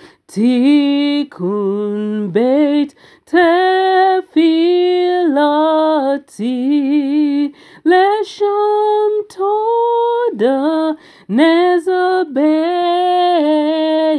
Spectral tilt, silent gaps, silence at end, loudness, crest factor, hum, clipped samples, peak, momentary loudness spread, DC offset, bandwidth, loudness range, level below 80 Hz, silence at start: -6 dB/octave; none; 0 s; -14 LUFS; 14 dB; none; under 0.1%; 0 dBFS; 7 LU; under 0.1%; 11 kHz; 2 LU; -70 dBFS; 0 s